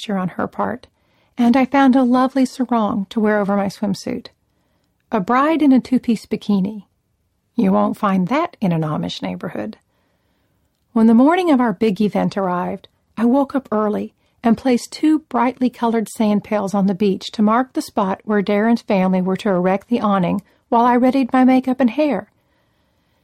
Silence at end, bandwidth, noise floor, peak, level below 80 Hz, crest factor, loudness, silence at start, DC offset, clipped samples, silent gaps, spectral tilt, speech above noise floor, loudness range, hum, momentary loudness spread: 1 s; 13 kHz; -67 dBFS; -4 dBFS; -58 dBFS; 14 dB; -18 LUFS; 0 s; under 0.1%; under 0.1%; none; -7 dB/octave; 50 dB; 3 LU; none; 11 LU